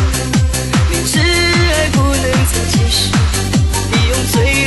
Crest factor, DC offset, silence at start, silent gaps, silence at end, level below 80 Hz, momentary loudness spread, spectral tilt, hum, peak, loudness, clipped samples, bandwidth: 12 dB; under 0.1%; 0 s; none; 0 s; -20 dBFS; 3 LU; -4 dB/octave; none; -2 dBFS; -13 LUFS; under 0.1%; 12.5 kHz